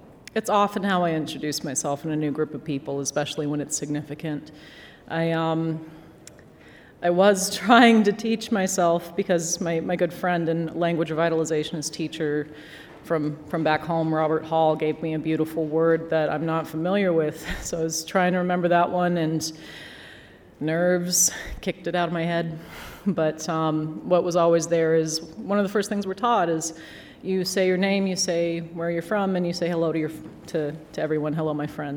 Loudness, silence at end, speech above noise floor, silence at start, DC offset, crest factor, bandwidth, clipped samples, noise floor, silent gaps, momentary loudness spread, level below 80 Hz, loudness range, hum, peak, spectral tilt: -24 LUFS; 0 s; 25 dB; 0 s; under 0.1%; 22 dB; over 20 kHz; under 0.1%; -49 dBFS; none; 11 LU; -54 dBFS; 6 LU; none; -2 dBFS; -4.5 dB/octave